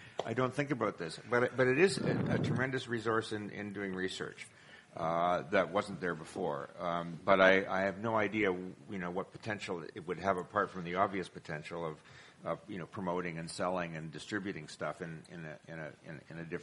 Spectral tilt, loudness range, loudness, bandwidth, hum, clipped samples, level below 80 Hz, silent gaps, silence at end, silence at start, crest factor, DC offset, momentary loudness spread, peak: -5.5 dB/octave; 8 LU; -35 LUFS; 11.5 kHz; none; under 0.1%; -68 dBFS; none; 0 s; 0 s; 26 dB; under 0.1%; 15 LU; -10 dBFS